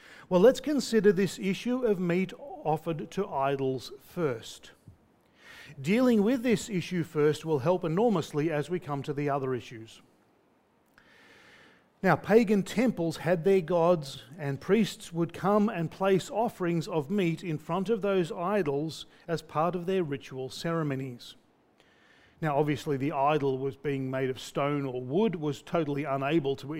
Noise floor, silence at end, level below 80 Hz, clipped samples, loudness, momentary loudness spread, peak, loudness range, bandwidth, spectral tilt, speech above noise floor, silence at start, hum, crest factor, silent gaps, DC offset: -67 dBFS; 0 s; -62 dBFS; under 0.1%; -29 LUFS; 12 LU; -8 dBFS; 6 LU; 16 kHz; -6.5 dB/octave; 38 dB; 0.1 s; none; 20 dB; none; under 0.1%